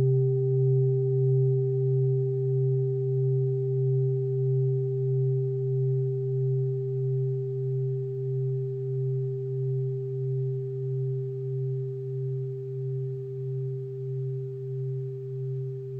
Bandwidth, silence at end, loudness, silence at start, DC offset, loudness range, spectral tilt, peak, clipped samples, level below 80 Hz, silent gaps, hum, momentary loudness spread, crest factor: 0.8 kHz; 0 s; -28 LUFS; 0 s; under 0.1%; 7 LU; -13.5 dB/octave; -16 dBFS; under 0.1%; -76 dBFS; none; none; 9 LU; 10 dB